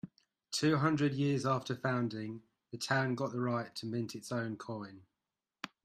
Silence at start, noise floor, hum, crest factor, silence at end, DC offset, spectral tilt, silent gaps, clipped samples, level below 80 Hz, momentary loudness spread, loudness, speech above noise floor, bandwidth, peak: 0.05 s; under -90 dBFS; none; 20 dB; 0.15 s; under 0.1%; -5.5 dB/octave; none; under 0.1%; -74 dBFS; 18 LU; -35 LUFS; over 56 dB; 14 kHz; -16 dBFS